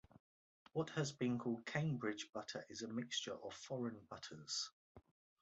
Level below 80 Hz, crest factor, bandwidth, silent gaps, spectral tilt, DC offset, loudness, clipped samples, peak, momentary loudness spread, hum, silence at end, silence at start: -80 dBFS; 20 dB; 8 kHz; 0.20-0.66 s, 4.72-4.95 s; -4.5 dB/octave; under 0.1%; -45 LUFS; under 0.1%; -26 dBFS; 9 LU; none; 0.4 s; 0.15 s